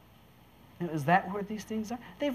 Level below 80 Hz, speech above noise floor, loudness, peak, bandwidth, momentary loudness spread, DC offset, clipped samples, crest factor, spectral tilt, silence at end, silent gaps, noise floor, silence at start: -64 dBFS; 27 dB; -32 LUFS; -10 dBFS; 15 kHz; 12 LU; under 0.1%; under 0.1%; 22 dB; -6 dB/octave; 0 s; none; -58 dBFS; 0.8 s